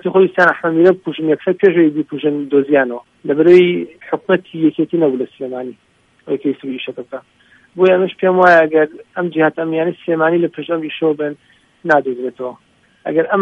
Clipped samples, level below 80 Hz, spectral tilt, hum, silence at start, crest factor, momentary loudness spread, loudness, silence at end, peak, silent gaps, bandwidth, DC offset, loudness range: under 0.1%; -66 dBFS; -8 dB/octave; none; 0.05 s; 16 dB; 15 LU; -15 LUFS; 0 s; 0 dBFS; none; 6.2 kHz; under 0.1%; 5 LU